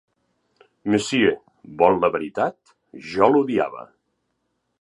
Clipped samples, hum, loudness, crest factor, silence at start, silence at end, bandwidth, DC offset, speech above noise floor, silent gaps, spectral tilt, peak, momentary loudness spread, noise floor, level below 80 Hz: under 0.1%; none; -21 LUFS; 22 dB; 0.85 s; 0.95 s; 11.5 kHz; under 0.1%; 53 dB; none; -5 dB/octave; 0 dBFS; 15 LU; -74 dBFS; -58 dBFS